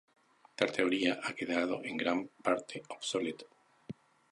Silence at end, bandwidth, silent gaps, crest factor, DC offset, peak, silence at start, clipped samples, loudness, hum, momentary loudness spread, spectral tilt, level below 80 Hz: 0.4 s; 11 kHz; none; 24 dB; under 0.1%; -12 dBFS; 0.6 s; under 0.1%; -34 LUFS; none; 20 LU; -4 dB/octave; -76 dBFS